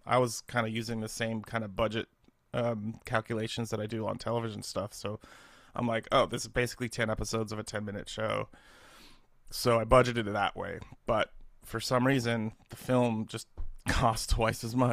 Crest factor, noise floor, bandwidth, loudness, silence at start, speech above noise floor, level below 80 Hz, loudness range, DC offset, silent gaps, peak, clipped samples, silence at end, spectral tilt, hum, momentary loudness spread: 24 dB; -56 dBFS; 15.5 kHz; -32 LUFS; 0.05 s; 25 dB; -46 dBFS; 5 LU; under 0.1%; none; -8 dBFS; under 0.1%; 0 s; -5 dB/octave; none; 12 LU